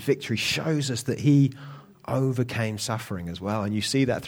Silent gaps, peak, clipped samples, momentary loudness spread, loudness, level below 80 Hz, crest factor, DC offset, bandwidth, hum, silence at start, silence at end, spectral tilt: none; -10 dBFS; under 0.1%; 11 LU; -26 LUFS; -58 dBFS; 16 dB; under 0.1%; 17 kHz; none; 0 s; 0 s; -5.5 dB/octave